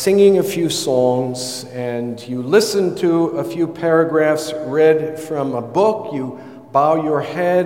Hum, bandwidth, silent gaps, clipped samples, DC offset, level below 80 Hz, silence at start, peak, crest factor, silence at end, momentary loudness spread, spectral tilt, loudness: none; 16.5 kHz; none; under 0.1%; 0.2%; -64 dBFS; 0 s; -2 dBFS; 16 dB; 0 s; 11 LU; -5 dB/octave; -17 LUFS